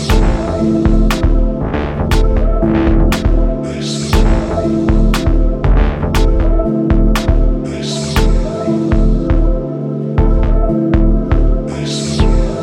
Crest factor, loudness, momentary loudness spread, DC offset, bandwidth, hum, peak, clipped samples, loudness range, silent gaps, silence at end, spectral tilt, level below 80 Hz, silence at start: 12 dB; -15 LUFS; 5 LU; under 0.1%; 13.5 kHz; none; 0 dBFS; under 0.1%; 1 LU; none; 0 s; -6.5 dB/octave; -14 dBFS; 0 s